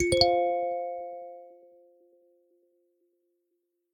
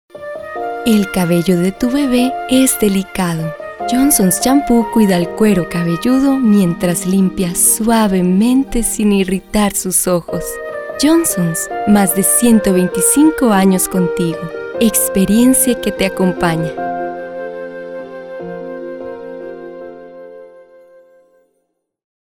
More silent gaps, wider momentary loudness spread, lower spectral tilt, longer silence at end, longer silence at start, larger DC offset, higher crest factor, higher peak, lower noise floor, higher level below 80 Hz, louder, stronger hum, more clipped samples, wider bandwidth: neither; first, 23 LU vs 16 LU; about the same, -4 dB/octave vs -4.5 dB/octave; first, 2.4 s vs 1.8 s; second, 0 s vs 0.15 s; neither; first, 26 dB vs 14 dB; second, -6 dBFS vs 0 dBFS; first, -79 dBFS vs -68 dBFS; second, -54 dBFS vs -38 dBFS; second, -27 LUFS vs -13 LUFS; neither; neither; about the same, 18 kHz vs 18.5 kHz